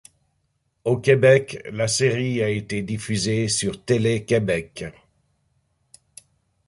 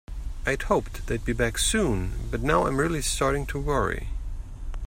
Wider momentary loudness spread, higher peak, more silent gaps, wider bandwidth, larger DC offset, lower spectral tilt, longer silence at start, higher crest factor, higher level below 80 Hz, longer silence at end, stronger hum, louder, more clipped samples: about the same, 13 LU vs 14 LU; first, -2 dBFS vs -8 dBFS; neither; second, 11.5 kHz vs 16 kHz; neither; about the same, -5 dB/octave vs -4 dB/octave; first, 0.85 s vs 0.1 s; about the same, 20 dB vs 18 dB; second, -54 dBFS vs -32 dBFS; first, 1.75 s vs 0 s; neither; first, -21 LUFS vs -26 LUFS; neither